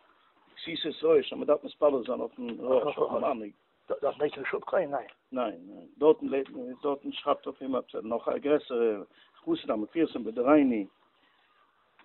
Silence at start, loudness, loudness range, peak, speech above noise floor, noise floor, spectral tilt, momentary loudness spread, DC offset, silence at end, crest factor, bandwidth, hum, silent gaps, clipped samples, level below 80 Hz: 0.55 s; -30 LUFS; 3 LU; -8 dBFS; 38 dB; -67 dBFS; -3.5 dB/octave; 12 LU; under 0.1%; 1.15 s; 22 dB; 4.3 kHz; none; none; under 0.1%; -72 dBFS